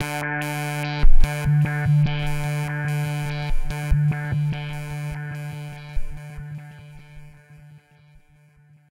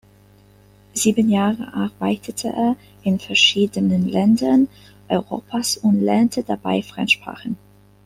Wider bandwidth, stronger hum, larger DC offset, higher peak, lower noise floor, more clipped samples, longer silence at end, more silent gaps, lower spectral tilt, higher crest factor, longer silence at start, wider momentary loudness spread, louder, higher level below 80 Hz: second, 14 kHz vs 15.5 kHz; second, none vs 50 Hz at -40 dBFS; neither; about the same, -2 dBFS vs -2 dBFS; first, -54 dBFS vs -50 dBFS; neither; first, 1.6 s vs 0.5 s; neither; first, -6.5 dB/octave vs -4.5 dB/octave; about the same, 18 dB vs 18 dB; second, 0 s vs 0.95 s; first, 17 LU vs 11 LU; second, -25 LUFS vs -19 LUFS; first, -24 dBFS vs -56 dBFS